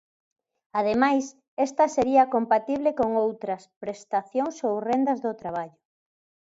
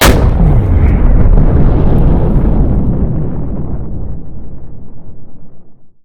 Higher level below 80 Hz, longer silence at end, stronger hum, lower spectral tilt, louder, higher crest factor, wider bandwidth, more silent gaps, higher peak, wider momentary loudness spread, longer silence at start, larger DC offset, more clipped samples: second, -64 dBFS vs -12 dBFS; first, 0.8 s vs 0.1 s; neither; about the same, -5.5 dB/octave vs -6.5 dB/octave; second, -25 LUFS vs -12 LUFS; first, 20 dB vs 10 dB; second, 7.8 kHz vs 18 kHz; first, 1.48-1.57 s, 3.76-3.81 s vs none; second, -6 dBFS vs 0 dBFS; second, 13 LU vs 19 LU; first, 0.75 s vs 0 s; neither; second, under 0.1% vs 0.5%